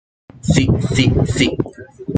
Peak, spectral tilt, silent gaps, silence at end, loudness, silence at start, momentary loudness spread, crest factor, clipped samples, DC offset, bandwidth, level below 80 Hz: -2 dBFS; -5.5 dB/octave; none; 0 s; -16 LUFS; 0.45 s; 12 LU; 16 dB; under 0.1%; under 0.1%; 9.4 kHz; -34 dBFS